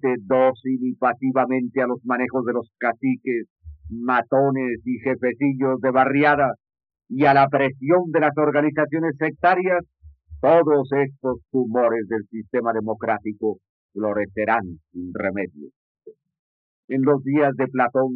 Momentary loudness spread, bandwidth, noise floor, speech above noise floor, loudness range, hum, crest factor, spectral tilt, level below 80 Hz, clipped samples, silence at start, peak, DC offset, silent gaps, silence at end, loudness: 11 LU; 5 kHz; -43 dBFS; 22 dB; 6 LU; none; 18 dB; -6 dB/octave; -56 dBFS; under 0.1%; 0.05 s; -4 dBFS; under 0.1%; 3.50-3.56 s, 13.69-13.89 s, 15.76-15.95 s, 16.39-16.88 s; 0 s; -21 LUFS